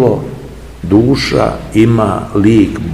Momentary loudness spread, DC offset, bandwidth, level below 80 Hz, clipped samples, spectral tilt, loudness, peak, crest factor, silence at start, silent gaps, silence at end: 16 LU; 0.7%; 12.5 kHz; -30 dBFS; 0.7%; -7 dB/octave; -11 LUFS; 0 dBFS; 12 dB; 0 s; none; 0 s